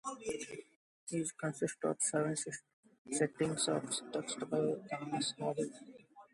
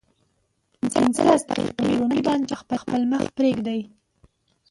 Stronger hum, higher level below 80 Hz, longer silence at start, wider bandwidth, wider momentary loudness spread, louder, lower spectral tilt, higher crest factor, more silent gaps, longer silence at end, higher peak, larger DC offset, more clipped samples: neither; second, -76 dBFS vs -56 dBFS; second, 0.05 s vs 0.85 s; about the same, 11.5 kHz vs 11.5 kHz; about the same, 12 LU vs 10 LU; second, -38 LUFS vs -22 LUFS; second, -3.5 dB/octave vs -5.5 dB/octave; about the same, 20 dB vs 20 dB; first, 0.76-1.07 s, 2.73-2.83 s, 2.98-3.05 s vs none; second, 0.1 s vs 0.85 s; second, -20 dBFS vs -4 dBFS; neither; neither